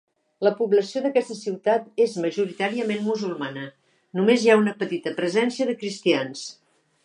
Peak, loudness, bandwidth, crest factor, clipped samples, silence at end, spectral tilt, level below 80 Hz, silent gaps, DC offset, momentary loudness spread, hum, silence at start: -4 dBFS; -23 LUFS; 10.5 kHz; 20 dB; under 0.1%; 0.5 s; -5 dB/octave; -78 dBFS; none; under 0.1%; 13 LU; none; 0.4 s